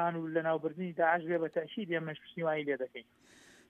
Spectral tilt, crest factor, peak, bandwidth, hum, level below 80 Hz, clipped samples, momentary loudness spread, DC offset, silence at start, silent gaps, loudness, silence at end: -7.5 dB/octave; 20 dB; -16 dBFS; 9.2 kHz; none; -82 dBFS; under 0.1%; 8 LU; under 0.1%; 0 s; none; -34 LUFS; 0.65 s